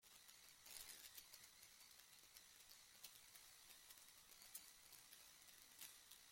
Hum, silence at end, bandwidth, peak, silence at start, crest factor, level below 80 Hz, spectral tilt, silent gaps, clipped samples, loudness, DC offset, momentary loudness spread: none; 0 s; 16.5 kHz; -40 dBFS; 0 s; 26 dB; -88 dBFS; 1 dB/octave; none; under 0.1%; -62 LUFS; under 0.1%; 6 LU